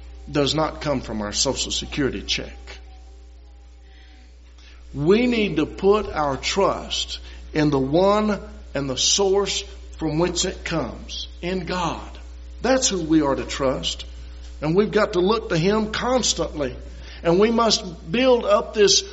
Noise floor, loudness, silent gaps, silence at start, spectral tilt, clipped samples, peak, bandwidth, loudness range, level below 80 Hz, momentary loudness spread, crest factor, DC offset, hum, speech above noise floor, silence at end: -45 dBFS; -21 LUFS; none; 0 s; -3.5 dB/octave; under 0.1%; -4 dBFS; 8 kHz; 5 LU; -38 dBFS; 14 LU; 20 dB; under 0.1%; none; 24 dB; 0 s